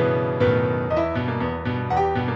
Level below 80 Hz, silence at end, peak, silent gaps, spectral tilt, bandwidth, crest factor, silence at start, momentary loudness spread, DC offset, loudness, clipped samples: -44 dBFS; 0 s; -8 dBFS; none; -8.5 dB/octave; 7 kHz; 14 dB; 0 s; 5 LU; under 0.1%; -23 LUFS; under 0.1%